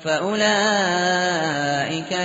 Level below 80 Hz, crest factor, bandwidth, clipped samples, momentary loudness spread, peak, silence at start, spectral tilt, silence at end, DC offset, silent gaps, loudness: -62 dBFS; 14 dB; 8 kHz; under 0.1%; 5 LU; -6 dBFS; 0 s; -2 dB/octave; 0 s; under 0.1%; none; -20 LUFS